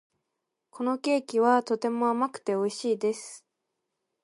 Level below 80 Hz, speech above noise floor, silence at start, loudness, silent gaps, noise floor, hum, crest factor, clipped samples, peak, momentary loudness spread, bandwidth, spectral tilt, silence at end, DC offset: -82 dBFS; 56 dB; 0.75 s; -27 LUFS; none; -83 dBFS; none; 20 dB; under 0.1%; -10 dBFS; 8 LU; 11.5 kHz; -4.5 dB/octave; 0.85 s; under 0.1%